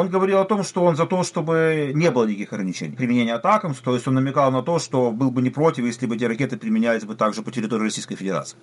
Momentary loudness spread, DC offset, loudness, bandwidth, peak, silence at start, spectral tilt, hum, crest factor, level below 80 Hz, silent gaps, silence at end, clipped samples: 7 LU; under 0.1%; -21 LUFS; 11.5 kHz; -6 dBFS; 0 s; -6 dB/octave; none; 16 dB; -66 dBFS; none; 0.1 s; under 0.1%